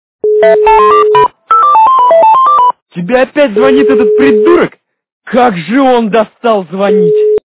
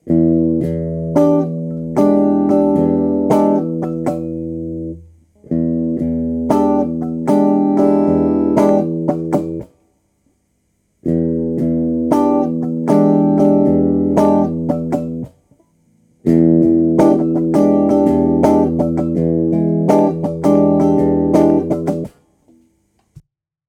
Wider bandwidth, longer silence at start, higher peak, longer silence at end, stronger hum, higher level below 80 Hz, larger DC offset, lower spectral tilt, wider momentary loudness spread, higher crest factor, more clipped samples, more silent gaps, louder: second, 4 kHz vs 11.5 kHz; first, 0.25 s vs 0.05 s; about the same, 0 dBFS vs 0 dBFS; second, 0.1 s vs 0.5 s; neither; about the same, -44 dBFS vs -40 dBFS; neither; about the same, -10 dB/octave vs -9.5 dB/octave; about the same, 7 LU vs 9 LU; second, 8 dB vs 14 dB; first, 0.3% vs under 0.1%; first, 2.82-2.86 s, 5.12-5.21 s vs none; first, -7 LUFS vs -15 LUFS